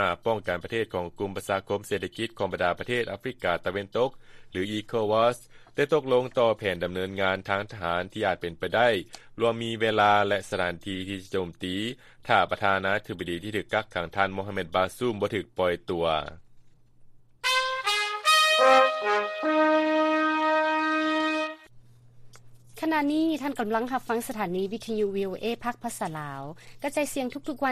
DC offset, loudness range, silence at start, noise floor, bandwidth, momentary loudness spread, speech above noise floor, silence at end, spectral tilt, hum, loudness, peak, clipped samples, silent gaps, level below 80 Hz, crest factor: under 0.1%; 7 LU; 0 s; -52 dBFS; 15 kHz; 11 LU; 25 dB; 0 s; -4 dB/octave; none; -27 LUFS; -6 dBFS; under 0.1%; none; -58 dBFS; 22 dB